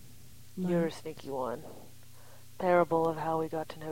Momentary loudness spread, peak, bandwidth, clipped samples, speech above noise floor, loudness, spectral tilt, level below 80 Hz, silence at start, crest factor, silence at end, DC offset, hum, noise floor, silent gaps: 17 LU; -12 dBFS; 16.5 kHz; under 0.1%; 24 dB; -32 LUFS; -7 dB/octave; -66 dBFS; 0.05 s; 20 dB; 0 s; 0.4%; none; -55 dBFS; none